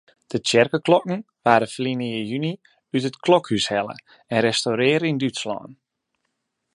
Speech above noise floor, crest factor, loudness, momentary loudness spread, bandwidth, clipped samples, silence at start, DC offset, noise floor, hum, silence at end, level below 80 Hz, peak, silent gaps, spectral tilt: 55 dB; 22 dB; -22 LUFS; 12 LU; 11.5 kHz; under 0.1%; 0.3 s; under 0.1%; -76 dBFS; none; 1 s; -64 dBFS; 0 dBFS; none; -4.5 dB/octave